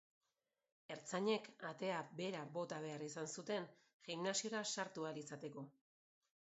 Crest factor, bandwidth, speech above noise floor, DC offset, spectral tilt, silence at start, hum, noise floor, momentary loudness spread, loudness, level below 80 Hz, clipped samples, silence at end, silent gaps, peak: 22 dB; 8 kHz; over 45 dB; under 0.1%; -3.5 dB/octave; 0.9 s; none; under -90 dBFS; 12 LU; -45 LUFS; under -90 dBFS; under 0.1%; 0.8 s; 3.94-4.00 s; -26 dBFS